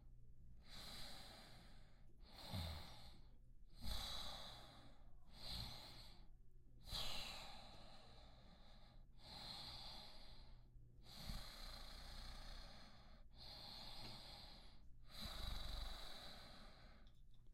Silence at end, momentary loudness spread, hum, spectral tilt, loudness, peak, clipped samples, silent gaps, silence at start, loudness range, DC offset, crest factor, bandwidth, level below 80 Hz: 0 s; 17 LU; none; -3.5 dB/octave; -55 LUFS; -34 dBFS; under 0.1%; none; 0 s; 5 LU; under 0.1%; 20 dB; 16 kHz; -60 dBFS